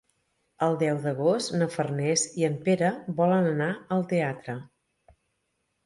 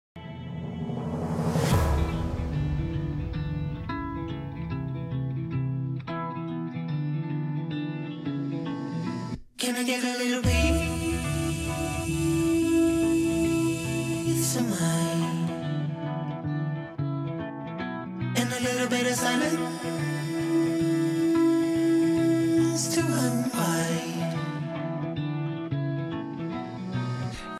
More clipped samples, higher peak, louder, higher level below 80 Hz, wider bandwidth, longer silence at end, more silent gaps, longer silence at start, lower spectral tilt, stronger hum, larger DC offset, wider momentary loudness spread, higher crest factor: neither; about the same, -10 dBFS vs -12 dBFS; about the same, -26 LUFS vs -28 LUFS; second, -70 dBFS vs -42 dBFS; second, 11.5 kHz vs 15.5 kHz; first, 1.2 s vs 0 s; neither; first, 0.6 s vs 0.15 s; about the same, -5 dB/octave vs -5.5 dB/octave; neither; neither; second, 5 LU vs 10 LU; about the same, 18 dB vs 16 dB